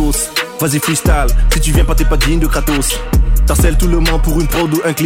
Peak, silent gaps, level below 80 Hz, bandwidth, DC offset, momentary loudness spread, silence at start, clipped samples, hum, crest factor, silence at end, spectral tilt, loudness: -2 dBFS; none; -14 dBFS; 16.5 kHz; under 0.1%; 3 LU; 0 s; under 0.1%; none; 10 dB; 0 s; -4.5 dB/octave; -14 LUFS